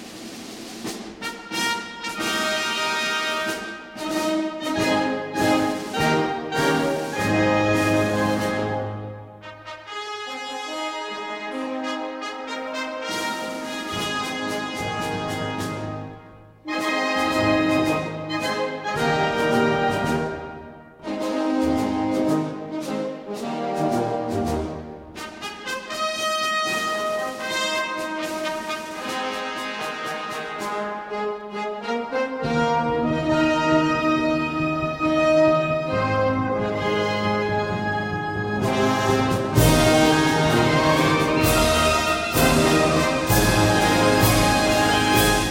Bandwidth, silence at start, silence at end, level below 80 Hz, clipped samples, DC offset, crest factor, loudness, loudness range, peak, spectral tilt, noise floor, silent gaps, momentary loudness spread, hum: 16.5 kHz; 0 s; 0 s; -42 dBFS; under 0.1%; under 0.1%; 18 dB; -22 LUFS; 10 LU; -4 dBFS; -4.5 dB/octave; -45 dBFS; none; 13 LU; none